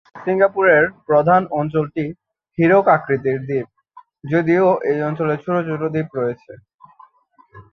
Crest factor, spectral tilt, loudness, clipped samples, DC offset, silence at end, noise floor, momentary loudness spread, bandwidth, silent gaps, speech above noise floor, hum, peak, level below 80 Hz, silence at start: 16 dB; -9.5 dB/octave; -18 LUFS; under 0.1%; under 0.1%; 0.1 s; -55 dBFS; 11 LU; 6.2 kHz; 6.75-6.79 s; 38 dB; none; -2 dBFS; -58 dBFS; 0.15 s